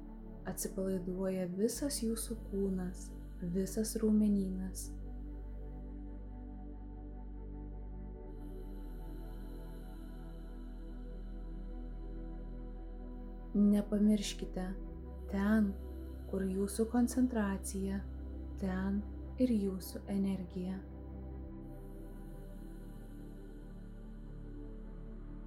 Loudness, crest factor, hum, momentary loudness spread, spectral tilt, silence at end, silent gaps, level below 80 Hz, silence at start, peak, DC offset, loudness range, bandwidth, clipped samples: -38 LUFS; 18 dB; none; 18 LU; -6 dB/octave; 0 s; none; -46 dBFS; 0 s; -20 dBFS; under 0.1%; 14 LU; 16 kHz; under 0.1%